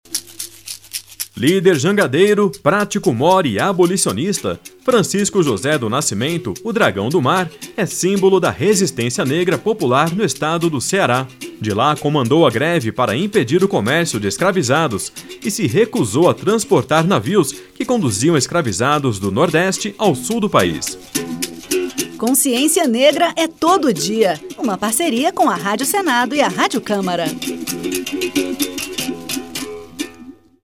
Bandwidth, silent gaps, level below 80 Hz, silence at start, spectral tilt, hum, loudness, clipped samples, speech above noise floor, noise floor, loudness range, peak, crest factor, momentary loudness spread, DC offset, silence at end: 17 kHz; none; -54 dBFS; 0.1 s; -4.5 dB/octave; none; -16 LUFS; under 0.1%; 24 dB; -40 dBFS; 2 LU; 0 dBFS; 16 dB; 10 LU; under 0.1%; 0.3 s